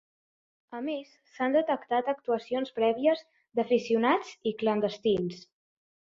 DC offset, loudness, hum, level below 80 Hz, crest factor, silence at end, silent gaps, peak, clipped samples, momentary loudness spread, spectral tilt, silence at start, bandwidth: under 0.1%; -29 LUFS; none; -70 dBFS; 18 dB; 0.75 s; none; -12 dBFS; under 0.1%; 10 LU; -6 dB/octave; 0.7 s; 7.6 kHz